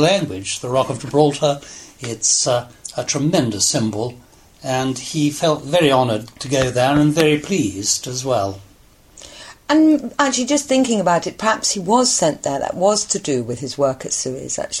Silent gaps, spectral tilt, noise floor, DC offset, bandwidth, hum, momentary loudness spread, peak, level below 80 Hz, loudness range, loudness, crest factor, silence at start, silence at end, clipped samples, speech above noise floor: none; -4 dB/octave; -48 dBFS; under 0.1%; 14.5 kHz; none; 11 LU; 0 dBFS; -50 dBFS; 2 LU; -18 LUFS; 18 dB; 0 s; 0 s; under 0.1%; 30 dB